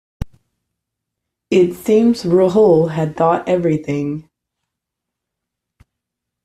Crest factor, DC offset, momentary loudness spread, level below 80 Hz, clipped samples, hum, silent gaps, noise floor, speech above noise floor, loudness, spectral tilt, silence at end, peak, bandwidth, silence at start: 16 dB; under 0.1%; 17 LU; -44 dBFS; under 0.1%; none; none; -81 dBFS; 67 dB; -15 LUFS; -7.5 dB/octave; 2.25 s; -2 dBFS; 14 kHz; 0.2 s